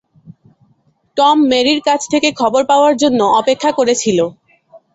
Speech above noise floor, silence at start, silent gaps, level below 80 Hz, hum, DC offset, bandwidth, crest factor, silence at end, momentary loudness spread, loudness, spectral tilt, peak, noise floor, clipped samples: 45 dB; 0.25 s; none; -56 dBFS; none; under 0.1%; 8.2 kHz; 14 dB; 0.2 s; 4 LU; -13 LUFS; -3.5 dB/octave; 0 dBFS; -57 dBFS; under 0.1%